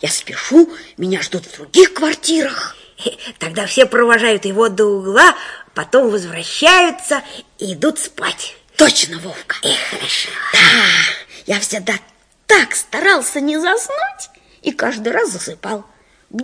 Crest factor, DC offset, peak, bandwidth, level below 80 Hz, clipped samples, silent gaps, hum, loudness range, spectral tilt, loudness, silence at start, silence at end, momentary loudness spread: 16 dB; under 0.1%; 0 dBFS; 11 kHz; -56 dBFS; 0.5%; none; none; 4 LU; -2 dB/octave; -14 LUFS; 0 s; 0 s; 17 LU